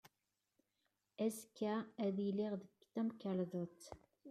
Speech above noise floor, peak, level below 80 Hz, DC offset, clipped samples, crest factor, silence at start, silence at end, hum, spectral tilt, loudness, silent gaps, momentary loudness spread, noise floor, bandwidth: 47 dB; -28 dBFS; -82 dBFS; under 0.1%; under 0.1%; 16 dB; 0.05 s; 0 s; none; -6.5 dB/octave; -43 LUFS; none; 17 LU; -89 dBFS; 14 kHz